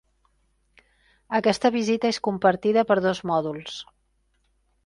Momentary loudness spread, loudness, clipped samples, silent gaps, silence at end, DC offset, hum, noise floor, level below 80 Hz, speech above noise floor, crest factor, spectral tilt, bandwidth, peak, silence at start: 12 LU; -23 LUFS; under 0.1%; none; 1.05 s; under 0.1%; none; -69 dBFS; -62 dBFS; 46 dB; 20 dB; -5 dB/octave; 11.5 kHz; -6 dBFS; 1.3 s